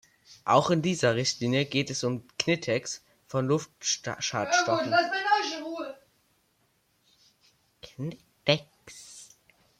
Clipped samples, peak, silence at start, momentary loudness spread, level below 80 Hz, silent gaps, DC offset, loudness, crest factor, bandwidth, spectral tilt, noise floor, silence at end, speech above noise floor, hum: under 0.1%; -8 dBFS; 0.3 s; 16 LU; -68 dBFS; none; under 0.1%; -28 LUFS; 22 dB; 15.5 kHz; -4 dB/octave; -70 dBFS; 0.55 s; 43 dB; none